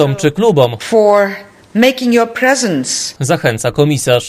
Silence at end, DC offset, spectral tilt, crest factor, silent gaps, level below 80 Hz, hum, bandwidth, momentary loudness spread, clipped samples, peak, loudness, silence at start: 0 s; under 0.1%; -4.5 dB/octave; 12 dB; none; -48 dBFS; none; 15.5 kHz; 6 LU; 0.1%; 0 dBFS; -12 LUFS; 0 s